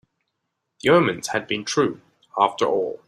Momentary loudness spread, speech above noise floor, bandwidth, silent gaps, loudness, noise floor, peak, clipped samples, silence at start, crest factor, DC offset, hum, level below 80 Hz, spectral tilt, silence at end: 9 LU; 57 dB; 13.5 kHz; none; -21 LUFS; -78 dBFS; -2 dBFS; under 0.1%; 0.85 s; 20 dB; under 0.1%; none; -64 dBFS; -4.5 dB/octave; 0.1 s